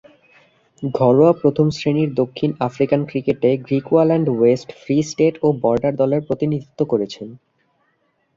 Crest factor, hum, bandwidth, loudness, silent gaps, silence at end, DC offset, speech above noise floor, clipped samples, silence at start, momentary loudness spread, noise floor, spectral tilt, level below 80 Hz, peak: 16 dB; none; 7.6 kHz; -18 LUFS; none; 1 s; under 0.1%; 48 dB; under 0.1%; 0.8 s; 8 LU; -65 dBFS; -7.5 dB/octave; -56 dBFS; -2 dBFS